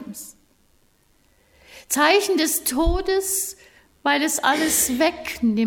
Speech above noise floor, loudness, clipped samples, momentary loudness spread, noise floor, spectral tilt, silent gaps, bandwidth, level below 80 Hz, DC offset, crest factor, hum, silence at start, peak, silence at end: 40 dB; -20 LUFS; under 0.1%; 11 LU; -60 dBFS; -2.5 dB/octave; none; 18 kHz; -36 dBFS; under 0.1%; 18 dB; none; 0 s; -4 dBFS; 0 s